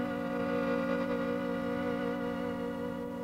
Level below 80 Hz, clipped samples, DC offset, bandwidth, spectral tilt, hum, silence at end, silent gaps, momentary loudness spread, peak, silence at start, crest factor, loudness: -60 dBFS; under 0.1%; under 0.1%; 16 kHz; -7 dB/octave; none; 0 s; none; 5 LU; -18 dBFS; 0 s; 14 dB; -34 LUFS